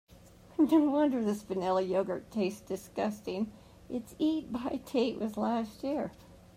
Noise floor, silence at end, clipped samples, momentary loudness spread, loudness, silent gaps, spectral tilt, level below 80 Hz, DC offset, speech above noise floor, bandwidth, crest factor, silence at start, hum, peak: -56 dBFS; 0.2 s; under 0.1%; 13 LU; -32 LUFS; none; -6.5 dB/octave; -62 dBFS; under 0.1%; 24 dB; 15.5 kHz; 18 dB; 0.6 s; none; -14 dBFS